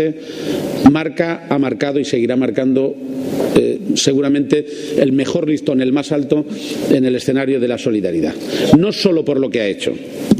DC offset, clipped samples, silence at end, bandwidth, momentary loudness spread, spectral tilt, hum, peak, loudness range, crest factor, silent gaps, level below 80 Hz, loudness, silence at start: under 0.1%; under 0.1%; 0 s; 15.5 kHz; 9 LU; -5.5 dB/octave; none; 0 dBFS; 1 LU; 16 dB; none; -48 dBFS; -16 LUFS; 0 s